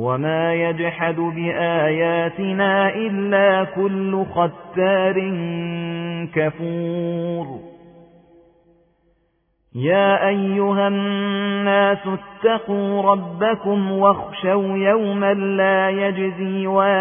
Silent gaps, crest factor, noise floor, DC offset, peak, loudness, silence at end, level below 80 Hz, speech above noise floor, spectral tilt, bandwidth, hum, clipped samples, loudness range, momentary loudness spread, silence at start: none; 18 dB; -65 dBFS; under 0.1%; -2 dBFS; -19 LUFS; 0 s; -60 dBFS; 46 dB; -10.5 dB/octave; 3.6 kHz; none; under 0.1%; 7 LU; 8 LU; 0 s